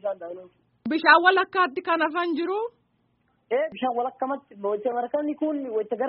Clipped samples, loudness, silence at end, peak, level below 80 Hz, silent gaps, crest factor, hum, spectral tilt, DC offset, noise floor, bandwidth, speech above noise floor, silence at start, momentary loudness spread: under 0.1%; -24 LUFS; 0 s; -4 dBFS; -76 dBFS; none; 22 dB; none; -0.5 dB/octave; under 0.1%; -69 dBFS; 5.4 kHz; 44 dB; 0.05 s; 15 LU